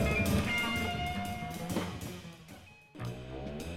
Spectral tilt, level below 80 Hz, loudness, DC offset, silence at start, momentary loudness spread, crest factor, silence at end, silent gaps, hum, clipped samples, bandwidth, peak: -5 dB/octave; -46 dBFS; -35 LUFS; under 0.1%; 0 s; 21 LU; 18 dB; 0 s; none; none; under 0.1%; 16 kHz; -18 dBFS